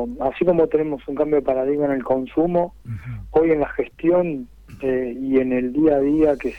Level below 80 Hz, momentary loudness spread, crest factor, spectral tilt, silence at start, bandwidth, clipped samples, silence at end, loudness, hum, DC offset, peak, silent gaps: -44 dBFS; 10 LU; 14 dB; -9.5 dB/octave; 0 s; 4.6 kHz; under 0.1%; 0 s; -20 LUFS; none; under 0.1%; -6 dBFS; none